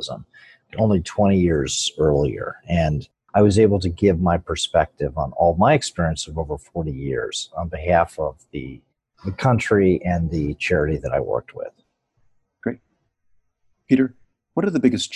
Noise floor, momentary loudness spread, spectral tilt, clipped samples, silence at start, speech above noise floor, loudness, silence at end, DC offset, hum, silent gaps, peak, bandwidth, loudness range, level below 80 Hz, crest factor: -68 dBFS; 14 LU; -6 dB/octave; under 0.1%; 0 s; 48 dB; -21 LUFS; 0 s; under 0.1%; none; none; -4 dBFS; 12 kHz; 7 LU; -36 dBFS; 16 dB